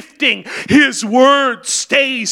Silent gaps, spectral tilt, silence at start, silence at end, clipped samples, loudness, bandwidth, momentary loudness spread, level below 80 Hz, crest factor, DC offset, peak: none; -2.5 dB/octave; 0 s; 0 s; under 0.1%; -13 LUFS; 15.5 kHz; 6 LU; -54 dBFS; 14 dB; under 0.1%; 0 dBFS